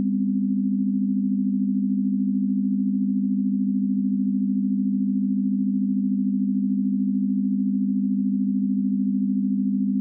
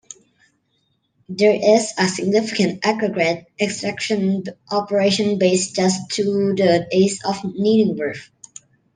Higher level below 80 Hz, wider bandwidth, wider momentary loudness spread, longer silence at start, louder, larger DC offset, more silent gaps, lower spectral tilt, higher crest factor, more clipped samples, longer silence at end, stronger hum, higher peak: second, -82 dBFS vs -64 dBFS; second, 0.4 kHz vs 10 kHz; second, 0 LU vs 8 LU; second, 0 s vs 1.3 s; second, -23 LUFS vs -19 LUFS; neither; neither; first, -26.5 dB/octave vs -4.5 dB/octave; second, 8 dB vs 18 dB; neither; second, 0 s vs 0.7 s; first, 50 Hz at -25 dBFS vs none; second, -14 dBFS vs -2 dBFS